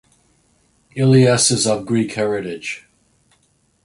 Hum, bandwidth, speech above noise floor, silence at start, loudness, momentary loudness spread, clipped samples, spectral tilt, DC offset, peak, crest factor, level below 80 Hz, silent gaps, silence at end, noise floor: none; 11.5 kHz; 45 dB; 0.95 s; -17 LUFS; 16 LU; under 0.1%; -4.5 dB/octave; under 0.1%; -2 dBFS; 18 dB; -56 dBFS; none; 1.05 s; -61 dBFS